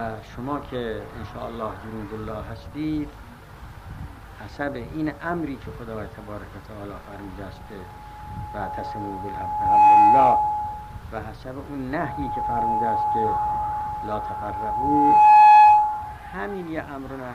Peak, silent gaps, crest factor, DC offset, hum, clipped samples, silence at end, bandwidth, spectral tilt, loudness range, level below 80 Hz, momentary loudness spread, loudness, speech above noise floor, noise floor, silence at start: -6 dBFS; none; 16 dB; under 0.1%; none; under 0.1%; 0 s; 8.2 kHz; -7 dB/octave; 17 LU; -44 dBFS; 24 LU; -20 LUFS; 18 dB; -42 dBFS; 0 s